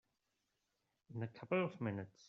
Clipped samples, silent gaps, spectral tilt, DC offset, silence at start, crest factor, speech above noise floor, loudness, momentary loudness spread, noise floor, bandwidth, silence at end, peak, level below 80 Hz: under 0.1%; none; -6.5 dB/octave; under 0.1%; 1.1 s; 20 dB; 45 dB; -42 LUFS; 9 LU; -86 dBFS; 7.2 kHz; 0.2 s; -26 dBFS; -84 dBFS